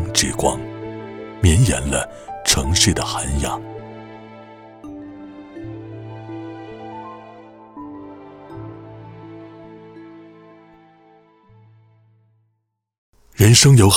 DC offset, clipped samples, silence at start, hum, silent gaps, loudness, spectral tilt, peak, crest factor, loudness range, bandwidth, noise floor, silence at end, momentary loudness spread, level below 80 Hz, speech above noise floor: under 0.1%; under 0.1%; 0 s; none; 12.98-13.13 s; -17 LUFS; -4 dB/octave; 0 dBFS; 20 dB; 21 LU; 16.5 kHz; -72 dBFS; 0 s; 26 LU; -34 dBFS; 57 dB